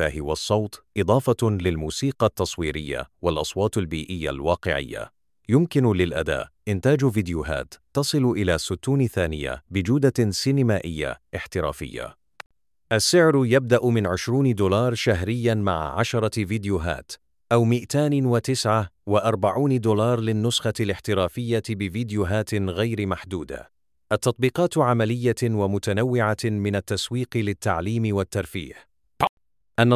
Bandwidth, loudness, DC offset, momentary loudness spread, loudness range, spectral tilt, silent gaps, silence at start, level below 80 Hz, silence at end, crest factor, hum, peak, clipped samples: 15.5 kHz; -23 LUFS; under 0.1%; 9 LU; 4 LU; -5.5 dB/octave; 12.46-12.50 s, 29.29-29.37 s; 0 s; -42 dBFS; 0 s; 20 dB; none; -4 dBFS; under 0.1%